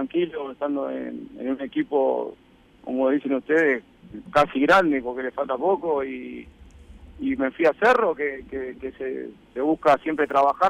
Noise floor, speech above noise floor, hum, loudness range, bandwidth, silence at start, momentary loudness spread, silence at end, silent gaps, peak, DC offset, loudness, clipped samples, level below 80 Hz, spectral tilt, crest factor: -46 dBFS; 23 dB; none; 3 LU; 12.5 kHz; 0 s; 15 LU; 0 s; none; -8 dBFS; under 0.1%; -23 LUFS; under 0.1%; -54 dBFS; -6 dB/octave; 14 dB